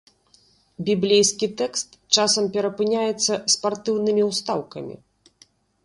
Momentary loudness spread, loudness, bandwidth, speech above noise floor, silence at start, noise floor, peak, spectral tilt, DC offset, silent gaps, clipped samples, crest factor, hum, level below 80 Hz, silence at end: 11 LU; -21 LUFS; 11.5 kHz; 37 dB; 0.8 s; -59 dBFS; -2 dBFS; -3 dB/octave; under 0.1%; none; under 0.1%; 22 dB; none; -66 dBFS; 0.9 s